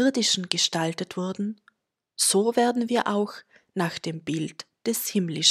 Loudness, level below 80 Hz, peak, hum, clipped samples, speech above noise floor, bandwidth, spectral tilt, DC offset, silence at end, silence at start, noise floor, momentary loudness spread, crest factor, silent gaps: -25 LUFS; -74 dBFS; 0 dBFS; none; under 0.1%; 40 dB; 16 kHz; -3 dB/octave; under 0.1%; 0 s; 0 s; -65 dBFS; 12 LU; 26 dB; none